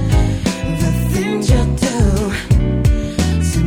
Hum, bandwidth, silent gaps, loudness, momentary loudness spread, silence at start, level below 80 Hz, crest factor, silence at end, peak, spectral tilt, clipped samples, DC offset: none; 17 kHz; none; -16 LUFS; 4 LU; 0 s; -20 dBFS; 14 dB; 0 s; 0 dBFS; -6 dB/octave; under 0.1%; under 0.1%